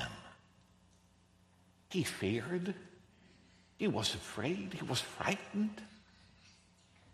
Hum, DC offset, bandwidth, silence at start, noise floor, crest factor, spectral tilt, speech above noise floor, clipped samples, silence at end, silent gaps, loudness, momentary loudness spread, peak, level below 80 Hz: none; under 0.1%; 13.5 kHz; 0 s; -67 dBFS; 24 dB; -4.5 dB/octave; 30 dB; under 0.1%; 0 s; none; -38 LUFS; 17 LU; -16 dBFS; -68 dBFS